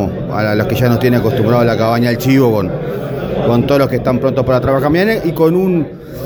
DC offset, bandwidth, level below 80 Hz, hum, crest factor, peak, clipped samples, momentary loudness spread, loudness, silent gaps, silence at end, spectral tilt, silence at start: under 0.1%; over 20 kHz; -36 dBFS; none; 12 dB; 0 dBFS; under 0.1%; 7 LU; -13 LUFS; none; 0 s; -7.5 dB/octave; 0 s